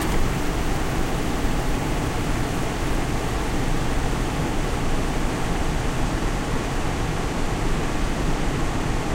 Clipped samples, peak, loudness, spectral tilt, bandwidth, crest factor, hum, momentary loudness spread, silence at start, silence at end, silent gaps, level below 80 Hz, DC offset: under 0.1%; -8 dBFS; -25 LUFS; -5 dB/octave; 16 kHz; 14 dB; none; 1 LU; 0 s; 0 s; none; -26 dBFS; under 0.1%